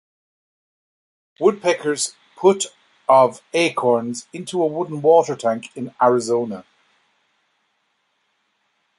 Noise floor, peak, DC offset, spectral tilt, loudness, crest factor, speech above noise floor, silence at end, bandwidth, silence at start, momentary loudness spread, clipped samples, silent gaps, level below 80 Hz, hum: -69 dBFS; -2 dBFS; under 0.1%; -4 dB/octave; -19 LUFS; 20 dB; 50 dB; 2.35 s; 11.5 kHz; 1.4 s; 13 LU; under 0.1%; none; -70 dBFS; none